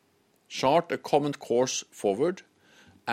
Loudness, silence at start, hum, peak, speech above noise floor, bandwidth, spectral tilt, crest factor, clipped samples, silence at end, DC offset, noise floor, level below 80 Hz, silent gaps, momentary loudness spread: -27 LUFS; 0.5 s; none; -10 dBFS; 40 dB; 16 kHz; -4 dB/octave; 20 dB; under 0.1%; 0 s; under 0.1%; -67 dBFS; -70 dBFS; none; 12 LU